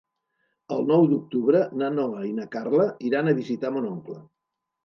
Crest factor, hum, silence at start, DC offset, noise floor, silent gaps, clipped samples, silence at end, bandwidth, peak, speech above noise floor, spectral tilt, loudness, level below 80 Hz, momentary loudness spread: 18 dB; none; 0.7 s; under 0.1%; -75 dBFS; none; under 0.1%; 0.6 s; 6.8 kHz; -8 dBFS; 51 dB; -9 dB/octave; -24 LUFS; -76 dBFS; 12 LU